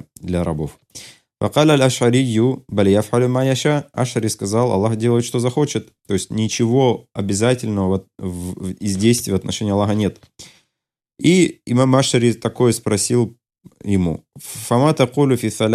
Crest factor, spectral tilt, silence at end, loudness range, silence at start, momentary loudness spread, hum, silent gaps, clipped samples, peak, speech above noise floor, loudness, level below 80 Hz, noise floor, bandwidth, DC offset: 16 dB; -5.5 dB/octave; 0 s; 3 LU; 0.2 s; 12 LU; none; none; under 0.1%; -2 dBFS; 64 dB; -18 LUFS; -52 dBFS; -82 dBFS; 14 kHz; under 0.1%